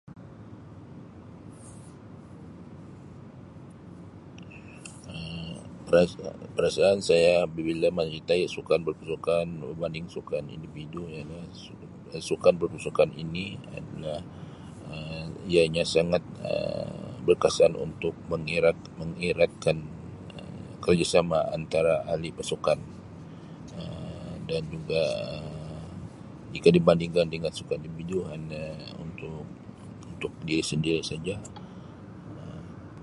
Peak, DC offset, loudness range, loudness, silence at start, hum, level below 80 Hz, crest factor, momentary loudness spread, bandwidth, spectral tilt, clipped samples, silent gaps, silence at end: -6 dBFS; under 0.1%; 11 LU; -28 LUFS; 0.05 s; none; -52 dBFS; 24 dB; 23 LU; 11.5 kHz; -5.5 dB/octave; under 0.1%; none; 0 s